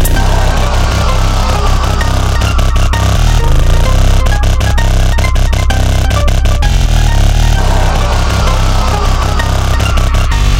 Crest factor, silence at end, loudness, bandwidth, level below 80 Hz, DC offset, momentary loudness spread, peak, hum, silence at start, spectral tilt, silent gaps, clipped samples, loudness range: 8 dB; 0 s; -12 LUFS; 15.5 kHz; -10 dBFS; 0.5%; 2 LU; 0 dBFS; none; 0 s; -5 dB/octave; none; under 0.1%; 0 LU